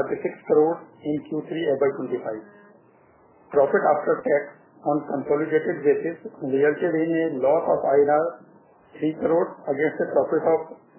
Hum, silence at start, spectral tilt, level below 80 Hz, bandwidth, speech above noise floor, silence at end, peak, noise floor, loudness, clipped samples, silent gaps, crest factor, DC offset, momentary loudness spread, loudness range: none; 0 s; -10.5 dB/octave; -68 dBFS; 3.2 kHz; 33 dB; 0.25 s; -8 dBFS; -56 dBFS; -23 LUFS; under 0.1%; none; 16 dB; under 0.1%; 10 LU; 4 LU